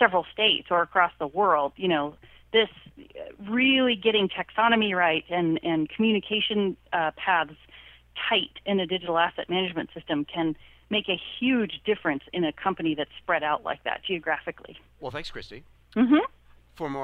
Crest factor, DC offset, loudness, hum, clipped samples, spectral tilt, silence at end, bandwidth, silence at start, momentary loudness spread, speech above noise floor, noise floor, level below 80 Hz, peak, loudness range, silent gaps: 22 dB; under 0.1%; -25 LUFS; none; under 0.1%; -6.5 dB/octave; 0 s; 8.2 kHz; 0 s; 14 LU; 25 dB; -51 dBFS; -58 dBFS; -4 dBFS; 5 LU; none